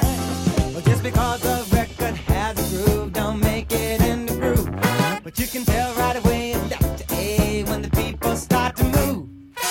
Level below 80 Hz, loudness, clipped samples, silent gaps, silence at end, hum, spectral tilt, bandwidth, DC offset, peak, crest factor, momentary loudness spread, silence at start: -30 dBFS; -22 LUFS; under 0.1%; none; 0 s; none; -5.5 dB/octave; 17 kHz; under 0.1%; -4 dBFS; 18 dB; 5 LU; 0 s